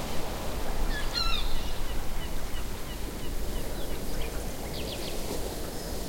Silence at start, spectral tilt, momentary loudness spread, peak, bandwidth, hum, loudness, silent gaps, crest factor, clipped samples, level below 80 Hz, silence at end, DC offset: 0 s; -4 dB/octave; 7 LU; -14 dBFS; 16.5 kHz; none; -35 LUFS; none; 14 dB; under 0.1%; -34 dBFS; 0 s; 0.5%